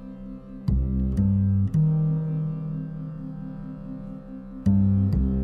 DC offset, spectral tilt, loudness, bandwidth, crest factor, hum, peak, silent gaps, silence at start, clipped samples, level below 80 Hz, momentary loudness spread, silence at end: under 0.1%; -11.5 dB/octave; -25 LUFS; 4.9 kHz; 14 dB; none; -10 dBFS; none; 0 s; under 0.1%; -34 dBFS; 16 LU; 0 s